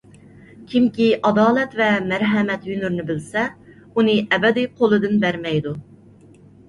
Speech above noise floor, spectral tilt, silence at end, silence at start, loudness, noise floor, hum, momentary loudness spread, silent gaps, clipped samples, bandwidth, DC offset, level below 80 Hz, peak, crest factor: 29 dB; -6.5 dB/octave; 0.85 s; 0.6 s; -19 LUFS; -47 dBFS; none; 8 LU; none; under 0.1%; 11 kHz; under 0.1%; -56 dBFS; -4 dBFS; 16 dB